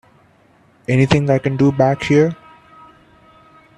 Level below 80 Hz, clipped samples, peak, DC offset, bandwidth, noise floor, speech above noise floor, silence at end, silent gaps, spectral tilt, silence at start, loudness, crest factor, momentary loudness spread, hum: -48 dBFS; under 0.1%; 0 dBFS; under 0.1%; 10 kHz; -53 dBFS; 38 dB; 1.45 s; none; -7.5 dB/octave; 0.9 s; -15 LUFS; 18 dB; 8 LU; none